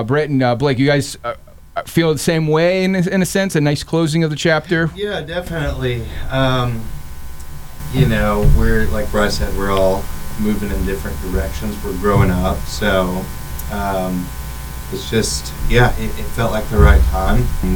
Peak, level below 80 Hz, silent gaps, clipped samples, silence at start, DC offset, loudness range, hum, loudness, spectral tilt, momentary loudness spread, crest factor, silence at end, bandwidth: 0 dBFS; -22 dBFS; none; under 0.1%; 0 s; under 0.1%; 4 LU; none; -17 LUFS; -5.5 dB/octave; 13 LU; 16 dB; 0 s; over 20 kHz